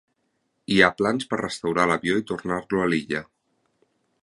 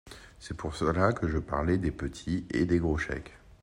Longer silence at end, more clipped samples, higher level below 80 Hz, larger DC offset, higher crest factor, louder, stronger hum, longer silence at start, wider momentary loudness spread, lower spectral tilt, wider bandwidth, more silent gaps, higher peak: first, 1 s vs 0.25 s; neither; second, -56 dBFS vs -44 dBFS; neither; about the same, 24 dB vs 20 dB; first, -23 LUFS vs -30 LUFS; neither; first, 0.7 s vs 0.05 s; second, 10 LU vs 15 LU; second, -5 dB/octave vs -7 dB/octave; about the same, 11.5 kHz vs 11 kHz; neither; first, -2 dBFS vs -12 dBFS